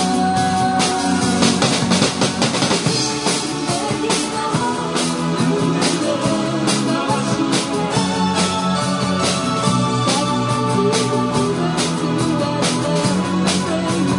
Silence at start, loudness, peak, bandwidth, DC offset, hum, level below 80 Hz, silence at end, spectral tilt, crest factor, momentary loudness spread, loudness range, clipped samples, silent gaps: 0 s; -18 LUFS; 0 dBFS; 11 kHz; under 0.1%; none; -50 dBFS; 0 s; -4.5 dB/octave; 18 dB; 3 LU; 2 LU; under 0.1%; none